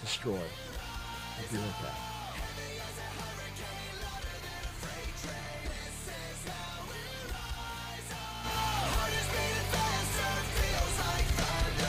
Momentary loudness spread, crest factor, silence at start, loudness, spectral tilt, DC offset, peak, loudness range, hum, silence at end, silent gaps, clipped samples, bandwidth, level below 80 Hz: 9 LU; 16 dB; 0 s; -36 LUFS; -3.5 dB/octave; under 0.1%; -18 dBFS; 9 LU; none; 0 s; none; under 0.1%; 16 kHz; -42 dBFS